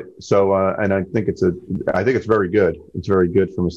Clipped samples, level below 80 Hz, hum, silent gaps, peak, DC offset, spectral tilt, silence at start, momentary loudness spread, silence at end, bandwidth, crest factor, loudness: under 0.1%; -40 dBFS; none; none; -4 dBFS; under 0.1%; -8 dB/octave; 0 s; 5 LU; 0 s; 7.6 kHz; 14 dB; -19 LUFS